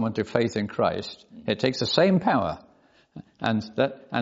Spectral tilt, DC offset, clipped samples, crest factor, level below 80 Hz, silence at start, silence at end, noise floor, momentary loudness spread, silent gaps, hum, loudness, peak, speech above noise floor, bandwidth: -4.5 dB/octave; under 0.1%; under 0.1%; 22 dB; -62 dBFS; 0 s; 0 s; -59 dBFS; 13 LU; none; none; -25 LUFS; -4 dBFS; 35 dB; 7.8 kHz